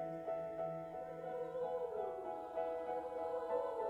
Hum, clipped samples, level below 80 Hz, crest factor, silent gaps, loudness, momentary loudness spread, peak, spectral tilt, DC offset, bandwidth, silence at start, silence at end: none; under 0.1%; -74 dBFS; 14 dB; none; -43 LUFS; 6 LU; -28 dBFS; -7 dB/octave; under 0.1%; 11 kHz; 0 s; 0 s